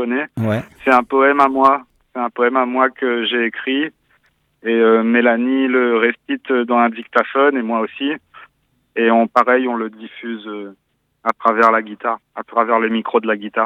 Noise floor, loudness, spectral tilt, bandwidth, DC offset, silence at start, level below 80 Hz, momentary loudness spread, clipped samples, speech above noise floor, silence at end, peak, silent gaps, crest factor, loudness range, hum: -60 dBFS; -16 LUFS; -7 dB/octave; 8.2 kHz; under 0.1%; 0 s; -62 dBFS; 14 LU; under 0.1%; 44 dB; 0 s; 0 dBFS; none; 16 dB; 3 LU; none